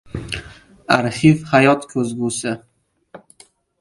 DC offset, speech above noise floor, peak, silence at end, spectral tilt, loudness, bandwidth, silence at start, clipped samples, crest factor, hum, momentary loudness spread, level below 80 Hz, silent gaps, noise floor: under 0.1%; 35 dB; 0 dBFS; 0.65 s; -5.5 dB/octave; -18 LUFS; 11.5 kHz; 0.15 s; under 0.1%; 20 dB; none; 15 LU; -46 dBFS; none; -51 dBFS